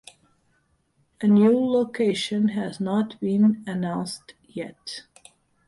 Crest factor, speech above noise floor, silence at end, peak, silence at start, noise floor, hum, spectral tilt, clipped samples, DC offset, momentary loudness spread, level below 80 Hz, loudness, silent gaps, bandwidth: 16 dB; 45 dB; 0.65 s; -8 dBFS; 1.2 s; -67 dBFS; none; -6.5 dB/octave; under 0.1%; under 0.1%; 19 LU; -66 dBFS; -23 LUFS; none; 11.5 kHz